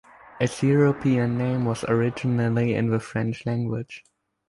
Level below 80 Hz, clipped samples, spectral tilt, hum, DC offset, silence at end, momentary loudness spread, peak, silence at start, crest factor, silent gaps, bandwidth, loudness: -56 dBFS; under 0.1%; -7.5 dB/octave; none; under 0.1%; 0.5 s; 8 LU; -8 dBFS; 0.35 s; 16 dB; none; 11.5 kHz; -24 LUFS